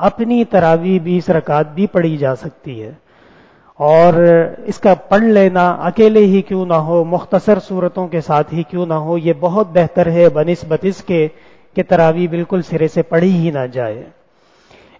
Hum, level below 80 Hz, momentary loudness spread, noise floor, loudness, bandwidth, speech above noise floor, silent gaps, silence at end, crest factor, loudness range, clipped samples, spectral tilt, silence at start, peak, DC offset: none; -48 dBFS; 10 LU; -52 dBFS; -14 LUFS; 7.8 kHz; 39 dB; none; 0.95 s; 14 dB; 5 LU; under 0.1%; -8.5 dB/octave; 0 s; 0 dBFS; under 0.1%